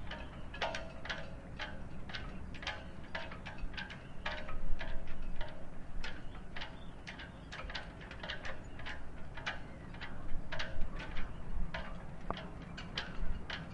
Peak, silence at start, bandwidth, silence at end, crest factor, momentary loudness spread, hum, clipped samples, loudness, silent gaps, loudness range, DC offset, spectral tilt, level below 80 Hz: -18 dBFS; 0 s; 7 kHz; 0 s; 18 dB; 6 LU; none; under 0.1%; -45 LUFS; none; 3 LU; under 0.1%; -5 dB/octave; -44 dBFS